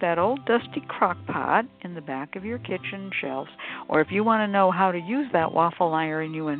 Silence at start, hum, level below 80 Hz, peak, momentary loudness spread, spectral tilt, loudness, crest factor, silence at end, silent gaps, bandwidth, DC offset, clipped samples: 0 s; none; -66 dBFS; -6 dBFS; 12 LU; -10.5 dB/octave; -25 LUFS; 18 dB; 0 s; none; 4.5 kHz; under 0.1%; under 0.1%